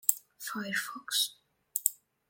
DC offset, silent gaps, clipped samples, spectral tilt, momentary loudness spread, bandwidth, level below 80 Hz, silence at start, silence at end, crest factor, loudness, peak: under 0.1%; none; under 0.1%; 0 dB/octave; 8 LU; 17 kHz; -86 dBFS; 0.05 s; 0.35 s; 34 dB; -32 LUFS; -2 dBFS